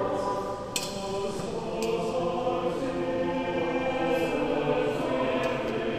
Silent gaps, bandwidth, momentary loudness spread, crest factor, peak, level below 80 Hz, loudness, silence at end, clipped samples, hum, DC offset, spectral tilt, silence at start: none; 15.5 kHz; 5 LU; 16 dB; -12 dBFS; -52 dBFS; -29 LUFS; 0 s; under 0.1%; none; 0.2%; -5 dB/octave; 0 s